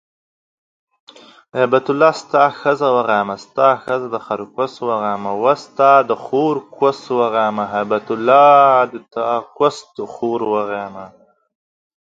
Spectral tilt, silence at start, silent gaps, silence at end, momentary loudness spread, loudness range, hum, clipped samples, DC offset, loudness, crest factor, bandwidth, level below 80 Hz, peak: -6 dB/octave; 1.55 s; none; 0.95 s; 12 LU; 3 LU; none; under 0.1%; under 0.1%; -16 LUFS; 16 dB; 7.8 kHz; -66 dBFS; 0 dBFS